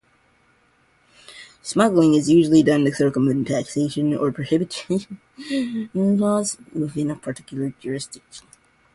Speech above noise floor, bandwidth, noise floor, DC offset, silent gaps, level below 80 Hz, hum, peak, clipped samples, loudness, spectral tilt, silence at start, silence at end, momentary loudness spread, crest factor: 40 dB; 11.5 kHz; -60 dBFS; under 0.1%; none; -58 dBFS; none; -4 dBFS; under 0.1%; -21 LUFS; -6 dB/octave; 1.3 s; 0.55 s; 15 LU; 18 dB